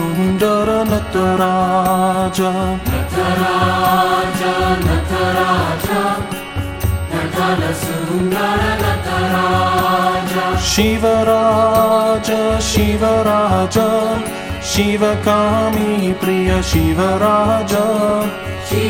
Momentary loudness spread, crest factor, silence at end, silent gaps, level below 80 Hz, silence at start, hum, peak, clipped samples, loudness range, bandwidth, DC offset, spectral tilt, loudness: 6 LU; 14 dB; 0 s; none; -30 dBFS; 0 s; none; -2 dBFS; under 0.1%; 4 LU; 17.5 kHz; under 0.1%; -5 dB/octave; -15 LUFS